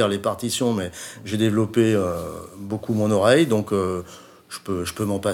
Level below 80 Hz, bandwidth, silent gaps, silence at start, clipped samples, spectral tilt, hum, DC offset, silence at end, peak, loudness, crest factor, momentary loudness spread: -54 dBFS; 17.5 kHz; none; 0 s; under 0.1%; -5.5 dB/octave; none; under 0.1%; 0 s; -2 dBFS; -22 LUFS; 20 dB; 17 LU